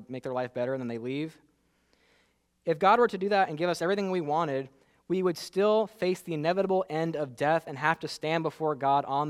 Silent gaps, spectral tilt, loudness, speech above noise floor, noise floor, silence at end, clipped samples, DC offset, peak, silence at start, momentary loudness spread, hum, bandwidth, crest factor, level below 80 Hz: none; -6 dB/octave; -29 LUFS; 42 dB; -70 dBFS; 0 s; under 0.1%; under 0.1%; -8 dBFS; 0 s; 9 LU; none; 15 kHz; 20 dB; -72 dBFS